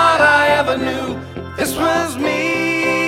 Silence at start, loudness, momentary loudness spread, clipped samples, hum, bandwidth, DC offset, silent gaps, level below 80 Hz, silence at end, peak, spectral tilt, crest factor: 0 s; -16 LUFS; 13 LU; under 0.1%; none; 16.5 kHz; under 0.1%; none; -46 dBFS; 0 s; 0 dBFS; -4 dB/octave; 16 dB